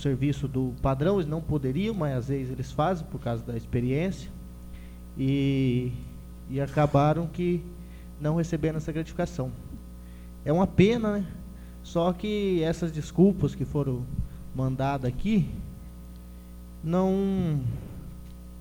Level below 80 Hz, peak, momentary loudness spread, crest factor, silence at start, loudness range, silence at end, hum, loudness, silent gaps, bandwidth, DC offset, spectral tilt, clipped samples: -42 dBFS; -6 dBFS; 21 LU; 22 dB; 0 s; 4 LU; 0 s; 60 Hz at -45 dBFS; -28 LUFS; none; 17 kHz; under 0.1%; -8 dB/octave; under 0.1%